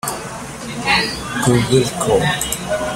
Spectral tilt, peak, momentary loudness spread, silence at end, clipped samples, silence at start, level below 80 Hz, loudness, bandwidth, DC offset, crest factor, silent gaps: -4 dB/octave; -2 dBFS; 13 LU; 0 s; under 0.1%; 0.05 s; -38 dBFS; -17 LUFS; 16 kHz; under 0.1%; 16 dB; none